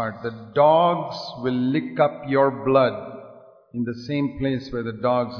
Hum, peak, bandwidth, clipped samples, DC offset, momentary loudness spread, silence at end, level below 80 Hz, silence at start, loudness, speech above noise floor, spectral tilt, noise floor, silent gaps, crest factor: none; -4 dBFS; 5.4 kHz; under 0.1%; under 0.1%; 14 LU; 0 s; -54 dBFS; 0 s; -22 LUFS; 25 dB; -8 dB/octave; -47 dBFS; none; 18 dB